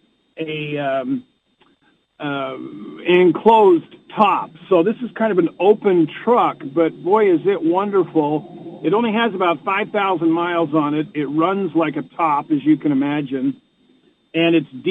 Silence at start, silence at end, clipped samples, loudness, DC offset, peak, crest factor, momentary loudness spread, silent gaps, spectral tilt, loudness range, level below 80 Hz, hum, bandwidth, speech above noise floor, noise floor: 0.35 s; 0 s; under 0.1%; -18 LUFS; under 0.1%; -2 dBFS; 16 dB; 11 LU; none; -8.5 dB/octave; 4 LU; -68 dBFS; none; 4.1 kHz; 42 dB; -60 dBFS